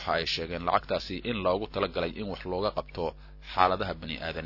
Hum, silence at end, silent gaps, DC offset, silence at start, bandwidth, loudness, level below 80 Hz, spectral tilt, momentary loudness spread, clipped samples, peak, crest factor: none; 0 s; none; under 0.1%; 0 s; 6 kHz; -30 LUFS; -48 dBFS; -5.5 dB/octave; 10 LU; under 0.1%; -6 dBFS; 26 dB